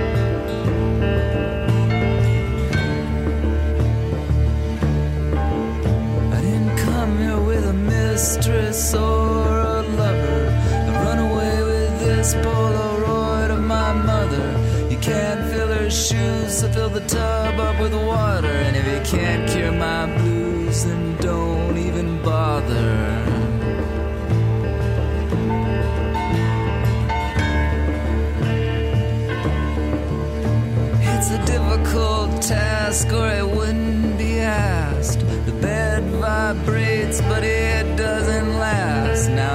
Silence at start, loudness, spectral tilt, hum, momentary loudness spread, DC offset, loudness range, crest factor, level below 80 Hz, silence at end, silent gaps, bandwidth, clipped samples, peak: 0 s; -20 LUFS; -5.5 dB/octave; none; 3 LU; under 0.1%; 2 LU; 12 dB; -24 dBFS; 0 s; none; 16 kHz; under 0.1%; -6 dBFS